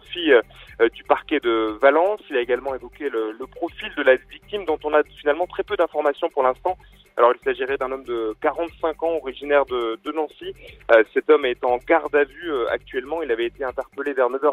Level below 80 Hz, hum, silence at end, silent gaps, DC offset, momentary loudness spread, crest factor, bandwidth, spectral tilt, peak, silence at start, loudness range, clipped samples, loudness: -52 dBFS; none; 0 s; none; under 0.1%; 12 LU; 20 dB; 10.5 kHz; -5.5 dB/octave; -2 dBFS; 0.1 s; 3 LU; under 0.1%; -22 LUFS